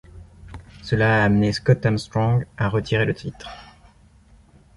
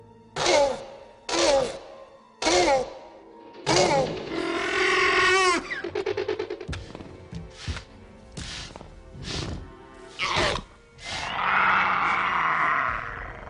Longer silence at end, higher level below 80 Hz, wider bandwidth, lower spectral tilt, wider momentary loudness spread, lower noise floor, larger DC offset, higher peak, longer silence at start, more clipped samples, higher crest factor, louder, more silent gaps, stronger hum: first, 1.15 s vs 0 s; about the same, -44 dBFS vs -46 dBFS; about the same, 11.5 kHz vs 10.5 kHz; first, -7 dB/octave vs -3 dB/octave; first, 23 LU vs 20 LU; first, -52 dBFS vs -48 dBFS; neither; first, -4 dBFS vs -8 dBFS; first, 0.15 s vs 0 s; neither; about the same, 18 dB vs 18 dB; first, -21 LUFS vs -24 LUFS; neither; neither